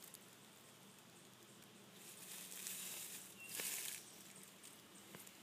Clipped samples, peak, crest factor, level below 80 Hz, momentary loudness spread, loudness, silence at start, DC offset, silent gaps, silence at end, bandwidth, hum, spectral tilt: under 0.1%; -26 dBFS; 28 dB; under -90 dBFS; 16 LU; -50 LUFS; 0 s; under 0.1%; none; 0 s; 15.5 kHz; none; -0.5 dB/octave